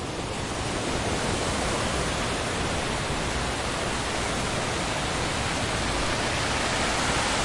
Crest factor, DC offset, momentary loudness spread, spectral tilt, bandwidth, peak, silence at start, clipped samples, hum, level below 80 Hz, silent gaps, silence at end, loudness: 16 dB; under 0.1%; 3 LU; -3.5 dB/octave; 11.5 kHz; -12 dBFS; 0 s; under 0.1%; none; -38 dBFS; none; 0 s; -26 LUFS